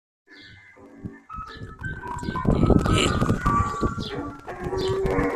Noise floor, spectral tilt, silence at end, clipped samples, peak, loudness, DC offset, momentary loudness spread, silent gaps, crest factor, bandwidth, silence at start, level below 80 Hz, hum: -48 dBFS; -6 dB/octave; 0 s; under 0.1%; -4 dBFS; -24 LUFS; under 0.1%; 19 LU; none; 22 dB; 14 kHz; 0.3 s; -34 dBFS; none